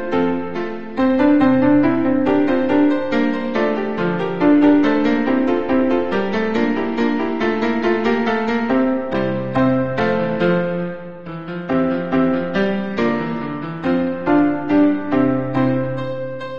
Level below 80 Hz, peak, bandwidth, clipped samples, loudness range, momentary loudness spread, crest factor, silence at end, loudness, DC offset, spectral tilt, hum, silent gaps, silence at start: -48 dBFS; -2 dBFS; 6.8 kHz; under 0.1%; 3 LU; 10 LU; 16 dB; 0 s; -18 LUFS; 2%; -8 dB/octave; none; none; 0 s